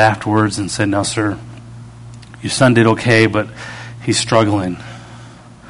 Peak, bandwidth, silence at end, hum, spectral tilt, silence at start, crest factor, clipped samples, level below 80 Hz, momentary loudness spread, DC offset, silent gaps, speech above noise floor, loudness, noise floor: 0 dBFS; 11 kHz; 0 s; none; -5 dB/octave; 0 s; 16 dB; under 0.1%; -46 dBFS; 24 LU; under 0.1%; none; 23 dB; -15 LUFS; -38 dBFS